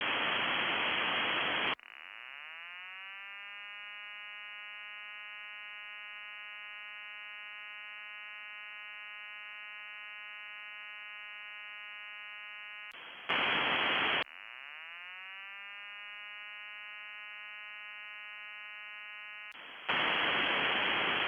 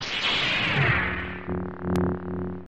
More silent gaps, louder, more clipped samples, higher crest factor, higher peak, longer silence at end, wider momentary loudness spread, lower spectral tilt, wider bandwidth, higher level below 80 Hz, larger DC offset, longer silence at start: neither; second, -37 LUFS vs -25 LUFS; neither; first, 22 dB vs 16 dB; second, -18 dBFS vs -10 dBFS; about the same, 0 s vs 0 s; first, 15 LU vs 10 LU; about the same, -4 dB/octave vs -5 dB/octave; first, 19.5 kHz vs 9 kHz; second, -78 dBFS vs -44 dBFS; second, under 0.1% vs 0.5%; about the same, 0 s vs 0 s